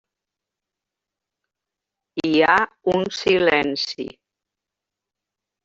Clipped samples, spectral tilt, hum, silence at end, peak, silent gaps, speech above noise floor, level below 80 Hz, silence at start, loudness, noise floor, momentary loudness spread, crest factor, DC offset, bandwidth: under 0.1%; -4.5 dB/octave; none; 1.55 s; -2 dBFS; none; 66 dB; -60 dBFS; 2.15 s; -19 LUFS; -86 dBFS; 15 LU; 22 dB; under 0.1%; 7.8 kHz